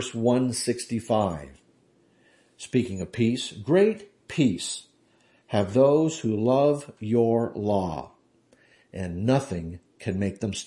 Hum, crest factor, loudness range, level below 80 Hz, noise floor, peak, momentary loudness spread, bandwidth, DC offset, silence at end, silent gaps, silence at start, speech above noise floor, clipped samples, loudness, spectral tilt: none; 18 dB; 4 LU; -60 dBFS; -62 dBFS; -8 dBFS; 14 LU; 11.5 kHz; under 0.1%; 0 s; none; 0 s; 38 dB; under 0.1%; -25 LUFS; -6 dB/octave